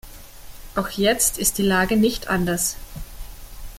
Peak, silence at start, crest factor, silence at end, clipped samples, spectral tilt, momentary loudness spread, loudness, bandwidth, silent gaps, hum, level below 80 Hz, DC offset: -4 dBFS; 0.05 s; 20 dB; 0 s; under 0.1%; -3.5 dB/octave; 22 LU; -20 LUFS; 17 kHz; none; none; -38 dBFS; under 0.1%